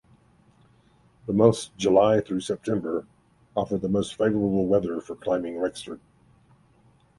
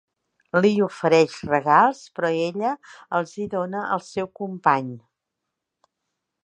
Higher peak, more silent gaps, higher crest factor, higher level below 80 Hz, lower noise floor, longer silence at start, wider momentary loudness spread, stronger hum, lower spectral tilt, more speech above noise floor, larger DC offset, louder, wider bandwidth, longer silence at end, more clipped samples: about the same, -4 dBFS vs -2 dBFS; neither; about the same, 22 dB vs 20 dB; first, -56 dBFS vs -64 dBFS; second, -60 dBFS vs -82 dBFS; first, 1.25 s vs 0.55 s; about the same, 12 LU vs 12 LU; neither; about the same, -6.5 dB/octave vs -6 dB/octave; second, 36 dB vs 60 dB; neither; second, -25 LUFS vs -22 LUFS; first, 11.5 kHz vs 9.4 kHz; second, 1.2 s vs 1.45 s; neither